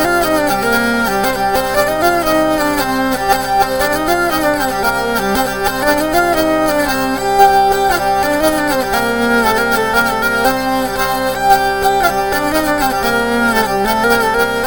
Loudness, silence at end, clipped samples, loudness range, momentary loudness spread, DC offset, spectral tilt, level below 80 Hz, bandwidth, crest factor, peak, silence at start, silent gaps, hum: -14 LUFS; 0 s; under 0.1%; 1 LU; 3 LU; 1%; -3.5 dB/octave; -34 dBFS; over 20 kHz; 14 dB; 0 dBFS; 0 s; none; 50 Hz at -40 dBFS